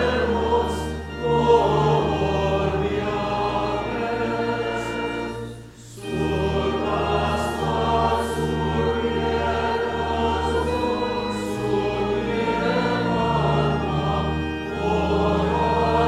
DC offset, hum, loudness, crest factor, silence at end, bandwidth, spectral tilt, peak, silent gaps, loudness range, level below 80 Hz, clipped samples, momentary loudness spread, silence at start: under 0.1%; none; -23 LUFS; 18 dB; 0 s; 14 kHz; -6.5 dB/octave; -4 dBFS; none; 4 LU; -36 dBFS; under 0.1%; 6 LU; 0 s